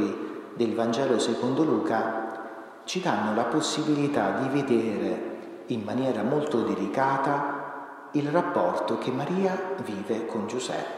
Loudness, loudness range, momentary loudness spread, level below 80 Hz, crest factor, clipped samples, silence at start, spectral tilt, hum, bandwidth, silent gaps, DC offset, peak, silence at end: -27 LUFS; 1 LU; 9 LU; -76 dBFS; 18 dB; under 0.1%; 0 s; -5.5 dB/octave; none; 13 kHz; none; under 0.1%; -8 dBFS; 0 s